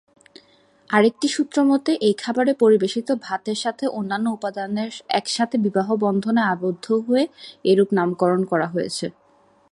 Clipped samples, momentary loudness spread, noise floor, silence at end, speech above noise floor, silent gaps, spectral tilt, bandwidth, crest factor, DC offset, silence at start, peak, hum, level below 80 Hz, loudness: under 0.1%; 8 LU; -56 dBFS; 0.6 s; 36 dB; none; -5 dB/octave; 11.5 kHz; 20 dB; under 0.1%; 0.9 s; -2 dBFS; none; -68 dBFS; -21 LUFS